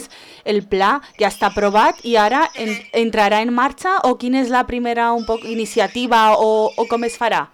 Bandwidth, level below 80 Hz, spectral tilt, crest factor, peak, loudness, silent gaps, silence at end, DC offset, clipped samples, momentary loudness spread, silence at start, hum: 18 kHz; -46 dBFS; -4 dB/octave; 10 dB; -6 dBFS; -17 LUFS; none; 0.1 s; under 0.1%; under 0.1%; 7 LU; 0 s; none